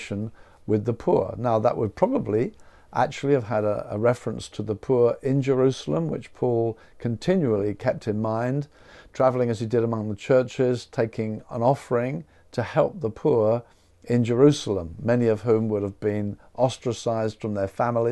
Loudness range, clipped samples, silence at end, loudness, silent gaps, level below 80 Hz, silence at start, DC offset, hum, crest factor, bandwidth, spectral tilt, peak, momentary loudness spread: 2 LU; under 0.1%; 0 s; -24 LUFS; none; -56 dBFS; 0 s; under 0.1%; none; 20 dB; 11.5 kHz; -7.5 dB/octave; -4 dBFS; 9 LU